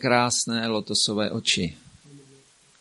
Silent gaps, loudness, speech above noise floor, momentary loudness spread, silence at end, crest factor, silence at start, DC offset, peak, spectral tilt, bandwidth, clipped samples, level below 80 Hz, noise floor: none; -23 LUFS; 32 dB; 5 LU; 0.6 s; 22 dB; 0 s; under 0.1%; -4 dBFS; -3 dB/octave; 11.5 kHz; under 0.1%; -58 dBFS; -56 dBFS